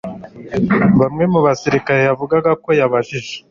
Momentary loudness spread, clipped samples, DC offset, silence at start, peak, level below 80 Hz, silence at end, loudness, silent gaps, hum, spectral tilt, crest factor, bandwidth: 12 LU; under 0.1%; under 0.1%; 0.05 s; -2 dBFS; -46 dBFS; 0.1 s; -15 LUFS; none; none; -7 dB/octave; 14 dB; 7.4 kHz